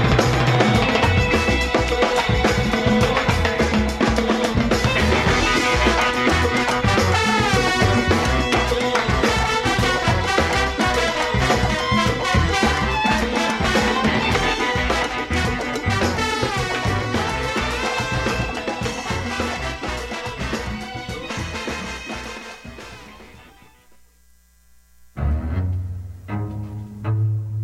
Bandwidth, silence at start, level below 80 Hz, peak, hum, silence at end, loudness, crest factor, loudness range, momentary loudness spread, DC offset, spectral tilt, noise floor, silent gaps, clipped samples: 15.5 kHz; 0 s; -30 dBFS; -2 dBFS; none; 0 s; -20 LUFS; 18 dB; 12 LU; 11 LU; under 0.1%; -5 dB/octave; -55 dBFS; none; under 0.1%